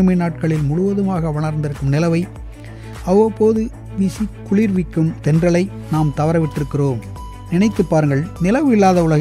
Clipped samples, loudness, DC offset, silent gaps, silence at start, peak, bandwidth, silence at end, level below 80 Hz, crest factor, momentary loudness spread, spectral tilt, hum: under 0.1%; -17 LUFS; under 0.1%; none; 0 s; -2 dBFS; 13 kHz; 0 s; -36 dBFS; 14 dB; 12 LU; -8 dB/octave; none